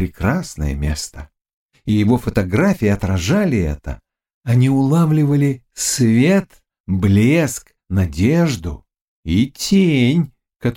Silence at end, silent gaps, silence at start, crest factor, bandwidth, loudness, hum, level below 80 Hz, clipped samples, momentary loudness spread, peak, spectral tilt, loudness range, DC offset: 0 s; 1.53-1.69 s, 4.34-4.41 s, 6.80-6.84 s, 9.04-9.23 s; 0 s; 14 dB; 17 kHz; -17 LUFS; none; -34 dBFS; under 0.1%; 14 LU; -2 dBFS; -6 dB/octave; 3 LU; under 0.1%